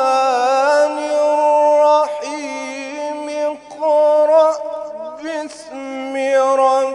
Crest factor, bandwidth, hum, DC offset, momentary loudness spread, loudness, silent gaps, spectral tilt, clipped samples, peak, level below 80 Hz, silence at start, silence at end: 14 dB; 11 kHz; none; under 0.1%; 14 LU; -16 LUFS; none; -2 dB/octave; under 0.1%; -2 dBFS; -68 dBFS; 0 s; 0 s